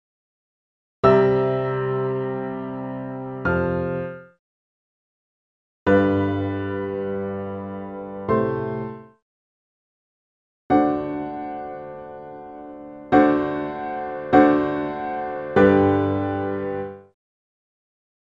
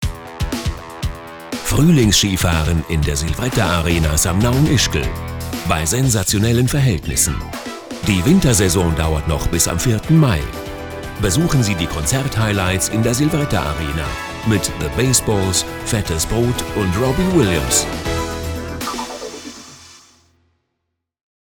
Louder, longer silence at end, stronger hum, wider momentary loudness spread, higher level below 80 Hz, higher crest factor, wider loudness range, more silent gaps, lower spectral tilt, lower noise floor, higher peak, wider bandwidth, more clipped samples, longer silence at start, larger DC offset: second, -22 LUFS vs -17 LUFS; second, 1.35 s vs 1.6 s; neither; first, 19 LU vs 13 LU; second, -54 dBFS vs -30 dBFS; first, 22 dB vs 14 dB; first, 8 LU vs 3 LU; first, 4.39-5.86 s, 9.22-10.70 s vs none; first, -9.5 dB/octave vs -4.5 dB/octave; first, under -90 dBFS vs -75 dBFS; about the same, -2 dBFS vs -4 dBFS; second, 5.8 kHz vs over 20 kHz; neither; first, 1.05 s vs 0 s; neither